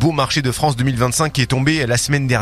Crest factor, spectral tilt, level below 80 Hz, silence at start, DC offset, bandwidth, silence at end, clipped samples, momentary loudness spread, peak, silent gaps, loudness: 16 dB; -4.5 dB/octave; -38 dBFS; 0 s; under 0.1%; 14.5 kHz; 0 s; under 0.1%; 2 LU; 0 dBFS; none; -17 LUFS